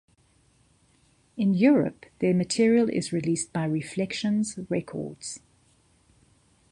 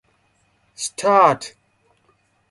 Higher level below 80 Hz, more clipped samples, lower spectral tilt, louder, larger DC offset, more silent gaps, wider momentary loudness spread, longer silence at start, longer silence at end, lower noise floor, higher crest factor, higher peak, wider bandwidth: about the same, -64 dBFS vs -68 dBFS; neither; first, -5.5 dB/octave vs -3.5 dB/octave; second, -26 LUFS vs -18 LUFS; neither; neither; about the same, 15 LU vs 15 LU; first, 1.35 s vs 0.8 s; first, 1.35 s vs 1 s; about the same, -63 dBFS vs -63 dBFS; about the same, 20 dB vs 20 dB; second, -8 dBFS vs -2 dBFS; about the same, 11.5 kHz vs 11.5 kHz